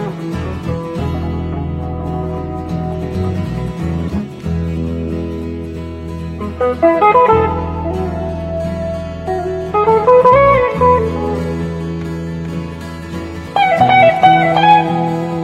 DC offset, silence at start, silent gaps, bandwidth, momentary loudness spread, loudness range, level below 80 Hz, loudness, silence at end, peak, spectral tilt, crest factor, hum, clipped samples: under 0.1%; 0 s; none; 12.5 kHz; 15 LU; 8 LU; -32 dBFS; -15 LUFS; 0 s; 0 dBFS; -7.5 dB/octave; 14 dB; none; under 0.1%